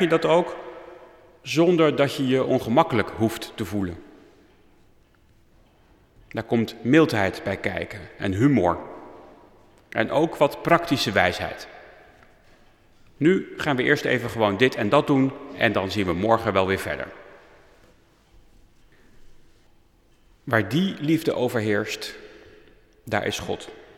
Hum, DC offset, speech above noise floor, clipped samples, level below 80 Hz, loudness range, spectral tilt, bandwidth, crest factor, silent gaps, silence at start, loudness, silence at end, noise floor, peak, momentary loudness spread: none; under 0.1%; 35 dB; under 0.1%; -54 dBFS; 8 LU; -6 dB/octave; 16 kHz; 22 dB; none; 0 s; -23 LUFS; 0.15 s; -57 dBFS; -4 dBFS; 15 LU